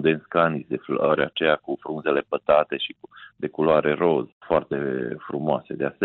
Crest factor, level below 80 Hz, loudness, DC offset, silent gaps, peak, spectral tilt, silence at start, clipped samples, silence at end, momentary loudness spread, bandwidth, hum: 16 dB; -58 dBFS; -24 LUFS; under 0.1%; 4.32-4.41 s; -8 dBFS; -10 dB/octave; 0 s; under 0.1%; 0 s; 10 LU; 4.2 kHz; none